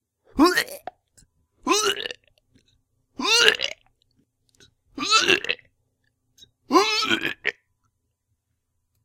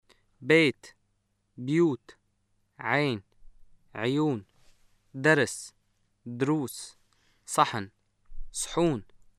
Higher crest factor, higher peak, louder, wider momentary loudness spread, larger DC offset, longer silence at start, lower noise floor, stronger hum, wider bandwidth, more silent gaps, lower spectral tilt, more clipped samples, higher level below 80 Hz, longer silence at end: about the same, 26 dB vs 24 dB; first, 0 dBFS vs -6 dBFS; first, -21 LUFS vs -27 LUFS; about the same, 19 LU vs 21 LU; neither; about the same, 0.35 s vs 0.4 s; about the same, -75 dBFS vs -74 dBFS; neither; first, 16.5 kHz vs 14 kHz; neither; second, -1 dB/octave vs -5 dB/octave; neither; second, -58 dBFS vs -52 dBFS; first, 1.55 s vs 0.35 s